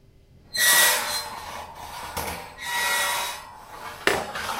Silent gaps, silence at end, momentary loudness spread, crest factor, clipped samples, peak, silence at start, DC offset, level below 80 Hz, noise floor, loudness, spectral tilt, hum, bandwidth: none; 0 s; 21 LU; 24 dB; under 0.1%; -2 dBFS; 0.45 s; under 0.1%; -52 dBFS; -53 dBFS; -22 LUFS; 0 dB/octave; none; 16 kHz